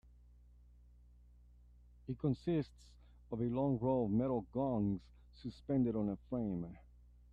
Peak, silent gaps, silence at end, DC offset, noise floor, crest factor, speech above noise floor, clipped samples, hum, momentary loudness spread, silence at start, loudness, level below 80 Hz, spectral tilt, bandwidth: -24 dBFS; none; 0.55 s; under 0.1%; -62 dBFS; 16 dB; 25 dB; under 0.1%; 60 Hz at -55 dBFS; 15 LU; 2.05 s; -38 LUFS; -60 dBFS; -10 dB/octave; 8.2 kHz